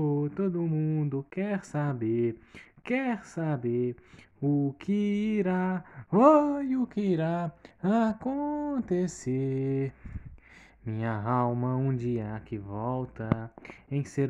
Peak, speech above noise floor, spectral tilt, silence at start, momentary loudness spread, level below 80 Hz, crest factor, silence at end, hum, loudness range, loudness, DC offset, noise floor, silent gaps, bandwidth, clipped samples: -8 dBFS; 25 dB; -8.5 dB/octave; 0 s; 10 LU; -58 dBFS; 20 dB; 0 s; none; 5 LU; -29 LUFS; under 0.1%; -54 dBFS; none; 10.5 kHz; under 0.1%